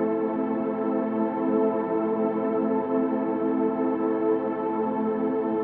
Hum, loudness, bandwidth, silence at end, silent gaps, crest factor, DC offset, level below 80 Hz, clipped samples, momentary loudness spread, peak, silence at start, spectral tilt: none; -26 LUFS; 3.8 kHz; 0 s; none; 14 dB; under 0.1%; -66 dBFS; under 0.1%; 2 LU; -12 dBFS; 0 s; -8 dB/octave